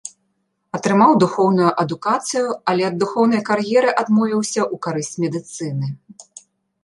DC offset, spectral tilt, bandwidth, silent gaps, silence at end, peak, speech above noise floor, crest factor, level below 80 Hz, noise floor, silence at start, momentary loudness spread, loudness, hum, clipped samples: under 0.1%; -5.5 dB/octave; 11.5 kHz; none; 0.6 s; -2 dBFS; 52 dB; 18 dB; -66 dBFS; -70 dBFS; 0.05 s; 12 LU; -18 LUFS; none; under 0.1%